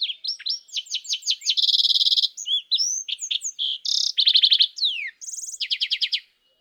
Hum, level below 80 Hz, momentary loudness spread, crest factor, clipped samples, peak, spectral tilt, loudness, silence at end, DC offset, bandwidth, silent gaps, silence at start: none; -88 dBFS; 12 LU; 18 dB; under 0.1%; -6 dBFS; 9 dB/octave; -20 LUFS; 0.4 s; under 0.1%; over 20 kHz; none; 0 s